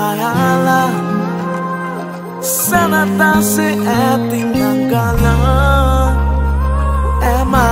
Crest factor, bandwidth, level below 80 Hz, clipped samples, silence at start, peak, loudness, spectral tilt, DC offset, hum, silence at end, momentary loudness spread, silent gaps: 12 dB; 16.5 kHz; -18 dBFS; under 0.1%; 0 s; 0 dBFS; -14 LUFS; -5.5 dB/octave; under 0.1%; none; 0 s; 8 LU; none